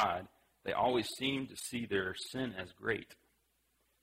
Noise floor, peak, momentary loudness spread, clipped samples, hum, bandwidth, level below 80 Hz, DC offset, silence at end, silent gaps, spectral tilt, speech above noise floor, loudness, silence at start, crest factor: -77 dBFS; -18 dBFS; 9 LU; under 0.1%; none; 16 kHz; -68 dBFS; under 0.1%; 0.9 s; none; -4 dB/octave; 40 dB; -37 LUFS; 0 s; 20 dB